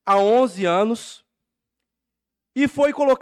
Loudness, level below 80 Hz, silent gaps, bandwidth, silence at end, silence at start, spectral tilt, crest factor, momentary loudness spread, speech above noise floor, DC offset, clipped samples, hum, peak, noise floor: -19 LUFS; -62 dBFS; none; 13 kHz; 0.05 s; 0.05 s; -5 dB/octave; 14 dB; 14 LU; 66 dB; under 0.1%; under 0.1%; none; -8 dBFS; -84 dBFS